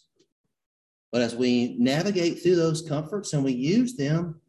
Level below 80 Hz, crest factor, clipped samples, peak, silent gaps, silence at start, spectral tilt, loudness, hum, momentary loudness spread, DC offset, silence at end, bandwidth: -62 dBFS; 14 dB; under 0.1%; -12 dBFS; none; 1.1 s; -6 dB/octave; -25 LUFS; none; 7 LU; under 0.1%; 0.15 s; 12 kHz